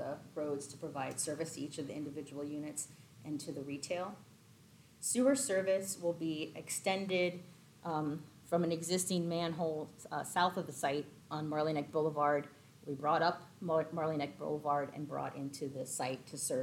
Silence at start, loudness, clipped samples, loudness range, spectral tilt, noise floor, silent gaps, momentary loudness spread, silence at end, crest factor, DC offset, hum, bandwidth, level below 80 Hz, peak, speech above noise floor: 0 s; -37 LUFS; under 0.1%; 6 LU; -4 dB/octave; -62 dBFS; none; 11 LU; 0 s; 20 dB; under 0.1%; none; 18 kHz; -78 dBFS; -18 dBFS; 25 dB